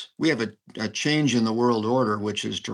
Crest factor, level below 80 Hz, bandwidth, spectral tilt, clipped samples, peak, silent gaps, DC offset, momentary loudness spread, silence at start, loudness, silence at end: 16 dB; -74 dBFS; 11.5 kHz; -5 dB/octave; under 0.1%; -8 dBFS; none; under 0.1%; 8 LU; 0 s; -24 LUFS; 0 s